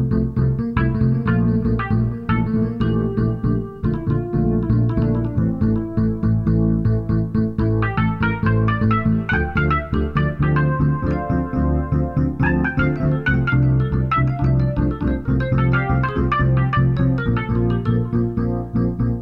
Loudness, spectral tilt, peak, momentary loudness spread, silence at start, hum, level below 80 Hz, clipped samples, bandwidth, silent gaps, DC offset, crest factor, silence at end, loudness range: -19 LUFS; -10.5 dB/octave; -4 dBFS; 3 LU; 0 s; none; -28 dBFS; under 0.1%; 5.2 kHz; none; under 0.1%; 14 dB; 0 s; 1 LU